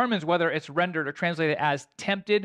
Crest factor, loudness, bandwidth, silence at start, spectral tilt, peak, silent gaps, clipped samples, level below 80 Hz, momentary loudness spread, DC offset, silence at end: 16 dB; -26 LUFS; 10.5 kHz; 0 s; -5.5 dB/octave; -12 dBFS; none; under 0.1%; -72 dBFS; 5 LU; under 0.1%; 0 s